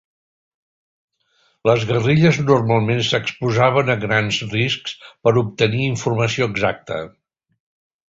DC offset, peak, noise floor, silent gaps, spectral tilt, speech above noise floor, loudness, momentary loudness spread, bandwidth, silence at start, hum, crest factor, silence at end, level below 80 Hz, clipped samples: under 0.1%; -2 dBFS; -63 dBFS; none; -5.5 dB/octave; 45 dB; -18 LUFS; 8 LU; 7.8 kHz; 1.65 s; none; 18 dB; 1 s; -50 dBFS; under 0.1%